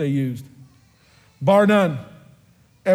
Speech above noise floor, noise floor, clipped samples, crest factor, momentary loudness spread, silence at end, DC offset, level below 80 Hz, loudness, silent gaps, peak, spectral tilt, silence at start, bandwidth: 37 dB; -55 dBFS; under 0.1%; 18 dB; 17 LU; 0 s; under 0.1%; -62 dBFS; -19 LUFS; none; -4 dBFS; -7.5 dB/octave; 0 s; 14 kHz